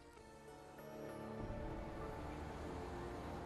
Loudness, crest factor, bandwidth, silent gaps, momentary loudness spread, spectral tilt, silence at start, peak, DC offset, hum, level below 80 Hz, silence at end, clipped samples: -50 LUFS; 16 dB; 13 kHz; none; 10 LU; -6.5 dB/octave; 0 s; -34 dBFS; under 0.1%; none; -56 dBFS; 0 s; under 0.1%